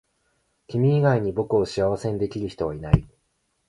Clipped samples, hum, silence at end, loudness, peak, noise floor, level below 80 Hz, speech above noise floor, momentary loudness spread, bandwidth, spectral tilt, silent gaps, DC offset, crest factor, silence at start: under 0.1%; none; 0.65 s; -23 LUFS; -2 dBFS; -71 dBFS; -40 dBFS; 49 dB; 9 LU; 11 kHz; -8 dB/octave; none; under 0.1%; 22 dB; 0.7 s